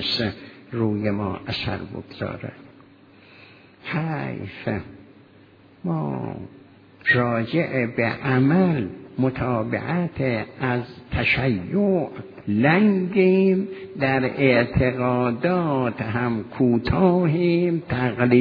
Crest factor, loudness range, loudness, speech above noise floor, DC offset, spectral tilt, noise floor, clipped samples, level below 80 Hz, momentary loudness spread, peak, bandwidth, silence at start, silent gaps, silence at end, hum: 18 dB; 11 LU; -22 LUFS; 29 dB; under 0.1%; -9 dB/octave; -51 dBFS; under 0.1%; -46 dBFS; 13 LU; -4 dBFS; 5.2 kHz; 0 s; none; 0 s; none